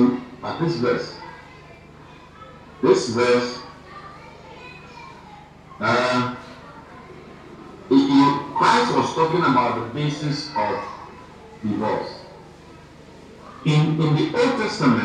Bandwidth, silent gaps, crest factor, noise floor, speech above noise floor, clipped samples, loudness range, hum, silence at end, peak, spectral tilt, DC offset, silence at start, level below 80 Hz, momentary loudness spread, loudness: 10 kHz; none; 20 dB; -44 dBFS; 24 dB; under 0.1%; 8 LU; none; 0 s; -4 dBFS; -6 dB/octave; under 0.1%; 0 s; -56 dBFS; 24 LU; -21 LUFS